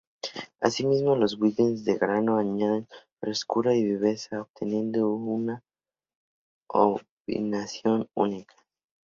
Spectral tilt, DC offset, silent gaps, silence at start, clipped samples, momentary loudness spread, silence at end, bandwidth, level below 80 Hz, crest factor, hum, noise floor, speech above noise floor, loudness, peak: -6 dB/octave; under 0.1%; 3.12-3.17 s, 4.50-4.54 s, 6.15-6.61 s, 7.11-7.25 s; 0.25 s; under 0.1%; 10 LU; 0.65 s; 7.6 kHz; -68 dBFS; 22 dB; none; under -90 dBFS; over 64 dB; -27 LUFS; -6 dBFS